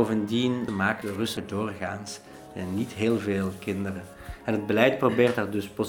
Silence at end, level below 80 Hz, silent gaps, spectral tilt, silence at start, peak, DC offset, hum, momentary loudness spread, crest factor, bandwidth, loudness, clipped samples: 0 s; -56 dBFS; none; -6 dB/octave; 0 s; -4 dBFS; under 0.1%; none; 15 LU; 24 dB; 19.5 kHz; -27 LUFS; under 0.1%